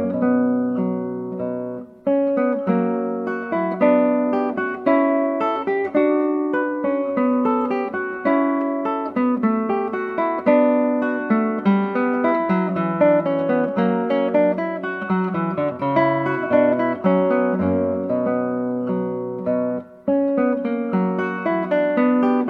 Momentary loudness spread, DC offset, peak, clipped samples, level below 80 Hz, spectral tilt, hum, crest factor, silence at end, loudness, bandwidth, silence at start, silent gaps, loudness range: 6 LU; under 0.1%; -4 dBFS; under 0.1%; -66 dBFS; -10 dB/octave; none; 16 dB; 0 s; -20 LUFS; 4.9 kHz; 0 s; none; 3 LU